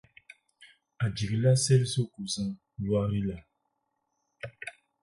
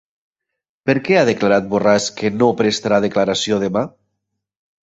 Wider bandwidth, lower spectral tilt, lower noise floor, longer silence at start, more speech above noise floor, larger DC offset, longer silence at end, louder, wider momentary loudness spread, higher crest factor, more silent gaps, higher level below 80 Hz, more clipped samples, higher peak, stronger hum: first, 11.5 kHz vs 8.2 kHz; about the same, -5.5 dB/octave vs -4.5 dB/octave; about the same, -79 dBFS vs -81 dBFS; second, 0.6 s vs 0.85 s; second, 52 dB vs 65 dB; neither; second, 0.3 s vs 0.95 s; second, -29 LUFS vs -17 LUFS; first, 19 LU vs 6 LU; about the same, 18 dB vs 16 dB; neither; about the same, -56 dBFS vs -54 dBFS; neither; second, -12 dBFS vs -2 dBFS; neither